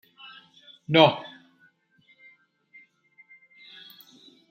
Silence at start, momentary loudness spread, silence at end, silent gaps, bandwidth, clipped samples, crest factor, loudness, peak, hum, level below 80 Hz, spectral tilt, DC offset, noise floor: 0.9 s; 29 LU; 3.25 s; none; 16 kHz; under 0.1%; 28 dB; -21 LUFS; -2 dBFS; none; -74 dBFS; -6.5 dB/octave; under 0.1%; -63 dBFS